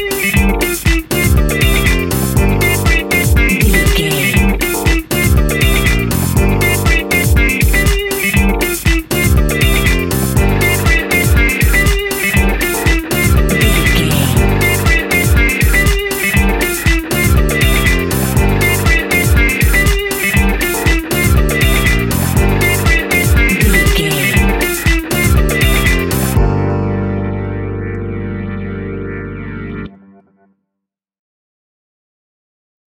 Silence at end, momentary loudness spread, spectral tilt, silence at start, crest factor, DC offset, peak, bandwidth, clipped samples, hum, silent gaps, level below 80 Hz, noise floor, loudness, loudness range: 3.1 s; 6 LU; -4.5 dB/octave; 0 s; 12 dB; under 0.1%; 0 dBFS; 17 kHz; under 0.1%; none; none; -16 dBFS; -78 dBFS; -12 LUFS; 7 LU